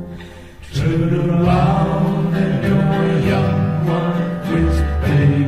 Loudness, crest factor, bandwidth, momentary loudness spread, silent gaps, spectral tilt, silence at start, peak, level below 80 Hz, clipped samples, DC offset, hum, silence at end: -17 LUFS; 14 dB; 13 kHz; 6 LU; none; -8.5 dB/octave; 0 s; -2 dBFS; -28 dBFS; under 0.1%; under 0.1%; none; 0 s